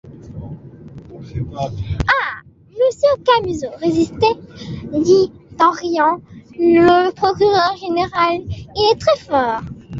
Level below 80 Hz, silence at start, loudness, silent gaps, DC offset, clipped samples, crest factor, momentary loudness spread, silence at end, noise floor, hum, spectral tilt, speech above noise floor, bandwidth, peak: -40 dBFS; 0.05 s; -16 LUFS; none; under 0.1%; under 0.1%; 16 dB; 19 LU; 0 s; -37 dBFS; none; -6 dB/octave; 21 dB; 7.8 kHz; -2 dBFS